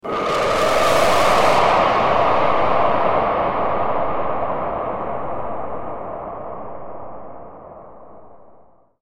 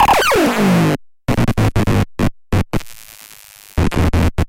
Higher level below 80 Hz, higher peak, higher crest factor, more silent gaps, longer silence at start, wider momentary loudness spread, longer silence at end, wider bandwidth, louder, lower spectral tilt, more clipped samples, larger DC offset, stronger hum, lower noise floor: second, -42 dBFS vs -26 dBFS; about the same, -2 dBFS vs 0 dBFS; about the same, 16 dB vs 16 dB; neither; about the same, 0.05 s vs 0 s; first, 20 LU vs 15 LU; first, 0.25 s vs 0 s; about the same, 16.5 kHz vs 17 kHz; about the same, -18 LUFS vs -16 LUFS; second, -4 dB/octave vs -6 dB/octave; neither; neither; neither; first, -51 dBFS vs -41 dBFS